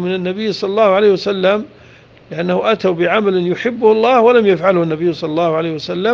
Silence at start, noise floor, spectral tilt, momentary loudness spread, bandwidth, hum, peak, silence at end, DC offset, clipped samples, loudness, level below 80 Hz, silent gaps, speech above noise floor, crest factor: 0 s; -43 dBFS; -7 dB/octave; 9 LU; 7.2 kHz; none; 0 dBFS; 0 s; under 0.1%; under 0.1%; -14 LUFS; -56 dBFS; none; 29 dB; 14 dB